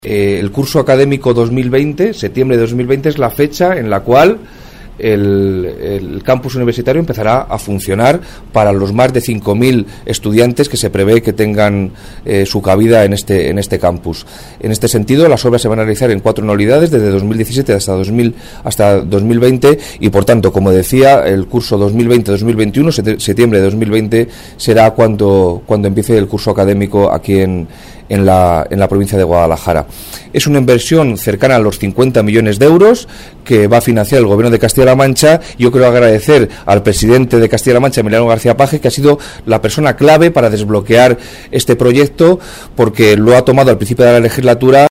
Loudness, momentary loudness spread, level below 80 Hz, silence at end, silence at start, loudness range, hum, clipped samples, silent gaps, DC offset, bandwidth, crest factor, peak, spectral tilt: -10 LUFS; 8 LU; -32 dBFS; 0 s; 0.05 s; 4 LU; none; 0.2%; none; under 0.1%; 16.5 kHz; 10 dB; 0 dBFS; -6 dB/octave